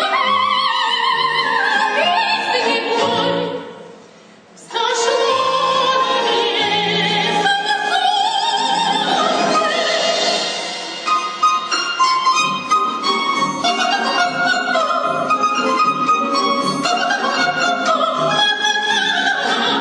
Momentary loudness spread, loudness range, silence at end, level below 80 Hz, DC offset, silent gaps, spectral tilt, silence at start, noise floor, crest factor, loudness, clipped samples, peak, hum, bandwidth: 3 LU; 2 LU; 0 s; -70 dBFS; under 0.1%; none; -2 dB/octave; 0 s; -44 dBFS; 14 dB; -16 LUFS; under 0.1%; -4 dBFS; none; 10.5 kHz